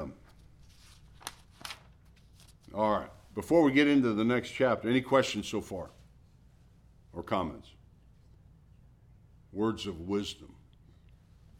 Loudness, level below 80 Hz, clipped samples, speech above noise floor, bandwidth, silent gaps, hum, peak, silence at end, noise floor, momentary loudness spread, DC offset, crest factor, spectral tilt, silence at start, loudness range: -30 LUFS; -58 dBFS; under 0.1%; 30 dB; 15 kHz; none; none; -12 dBFS; 1.15 s; -59 dBFS; 21 LU; under 0.1%; 22 dB; -5.5 dB/octave; 0 s; 14 LU